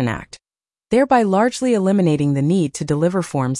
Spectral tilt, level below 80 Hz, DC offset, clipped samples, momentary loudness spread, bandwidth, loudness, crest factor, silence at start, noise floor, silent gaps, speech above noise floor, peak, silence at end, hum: -6.5 dB/octave; -50 dBFS; under 0.1%; under 0.1%; 6 LU; 11.5 kHz; -18 LUFS; 14 dB; 0 s; under -90 dBFS; none; over 73 dB; -4 dBFS; 0 s; none